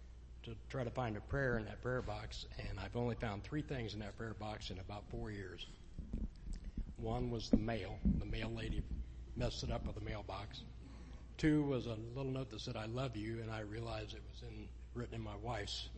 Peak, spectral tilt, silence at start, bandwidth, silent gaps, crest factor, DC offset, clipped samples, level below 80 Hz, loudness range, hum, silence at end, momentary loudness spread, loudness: -18 dBFS; -6.5 dB/octave; 0 s; 8.4 kHz; none; 24 dB; under 0.1%; under 0.1%; -50 dBFS; 5 LU; none; 0 s; 14 LU; -43 LUFS